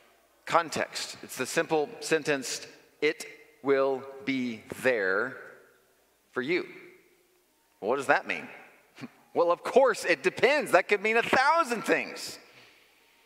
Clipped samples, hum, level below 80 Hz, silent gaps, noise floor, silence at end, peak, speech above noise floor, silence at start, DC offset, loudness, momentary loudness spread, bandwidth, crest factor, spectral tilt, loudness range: under 0.1%; none; -76 dBFS; none; -67 dBFS; 0.85 s; -4 dBFS; 40 dB; 0.45 s; under 0.1%; -28 LUFS; 16 LU; 16 kHz; 24 dB; -3.5 dB/octave; 8 LU